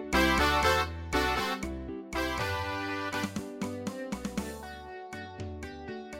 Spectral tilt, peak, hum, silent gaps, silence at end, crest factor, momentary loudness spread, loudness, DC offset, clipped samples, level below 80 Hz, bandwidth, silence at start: -4 dB/octave; -12 dBFS; none; none; 0 s; 20 dB; 17 LU; -31 LUFS; under 0.1%; under 0.1%; -44 dBFS; 16.5 kHz; 0 s